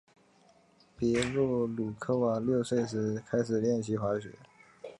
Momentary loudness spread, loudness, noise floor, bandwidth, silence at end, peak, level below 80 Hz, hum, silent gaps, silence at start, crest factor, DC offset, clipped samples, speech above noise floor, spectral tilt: 6 LU; -31 LUFS; -63 dBFS; 11 kHz; 0.05 s; -12 dBFS; -60 dBFS; none; none; 1 s; 20 dB; under 0.1%; under 0.1%; 33 dB; -6.5 dB/octave